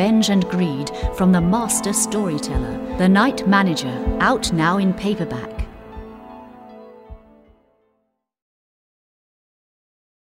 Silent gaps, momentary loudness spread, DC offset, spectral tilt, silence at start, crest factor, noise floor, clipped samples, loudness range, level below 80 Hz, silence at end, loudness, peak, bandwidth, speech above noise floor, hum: none; 20 LU; under 0.1%; -5 dB/octave; 0 s; 18 dB; -71 dBFS; under 0.1%; 13 LU; -36 dBFS; 3.15 s; -19 LUFS; -2 dBFS; 16 kHz; 53 dB; none